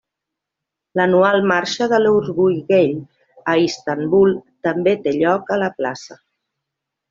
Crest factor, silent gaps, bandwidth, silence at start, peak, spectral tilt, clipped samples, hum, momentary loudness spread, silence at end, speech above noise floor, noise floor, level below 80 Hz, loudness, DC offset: 16 dB; none; 7.6 kHz; 0.95 s; -2 dBFS; -6 dB/octave; under 0.1%; none; 10 LU; 0.95 s; 66 dB; -82 dBFS; -58 dBFS; -17 LUFS; under 0.1%